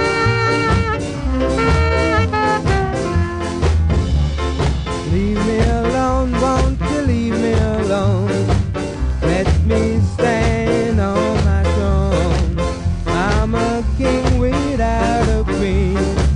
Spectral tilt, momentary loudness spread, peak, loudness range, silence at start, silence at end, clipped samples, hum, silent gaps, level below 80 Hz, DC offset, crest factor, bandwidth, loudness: -6.5 dB/octave; 4 LU; -2 dBFS; 1 LU; 0 s; 0 s; under 0.1%; none; none; -20 dBFS; under 0.1%; 12 dB; 10.5 kHz; -17 LUFS